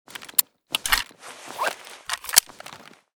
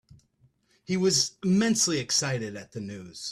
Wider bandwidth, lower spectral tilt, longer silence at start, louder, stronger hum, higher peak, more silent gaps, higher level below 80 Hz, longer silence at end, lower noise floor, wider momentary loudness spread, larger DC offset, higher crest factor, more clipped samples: first, over 20 kHz vs 14 kHz; second, 1.5 dB/octave vs -3.5 dB/octave; second, 0.2 s vs 0.9 s; about the same, -23 LUFS vs -25 LUFS; neither; first, 0 dBFS vs -12 dBFS; neither; first, -48 dBFS vs -64 dBFS; first, 0.4 s vs 0 s; second, -45 dBFS vs -66 dBFS; first, 23 LU vs 15 LU; neither; first, 28 dB vs 16 dB; neither